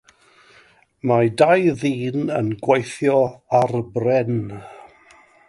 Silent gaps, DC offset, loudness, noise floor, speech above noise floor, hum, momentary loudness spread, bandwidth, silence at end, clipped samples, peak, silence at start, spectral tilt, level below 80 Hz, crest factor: none; under 0.1%; -19 LUFS; -53 dBFS; 35 dB; none; 10 LU; 11.5 kHz; 0.7 s; under 0.1%; -2 dBFS; 1.05 s; -7 dB/octave; -58 dBFS; 18 dB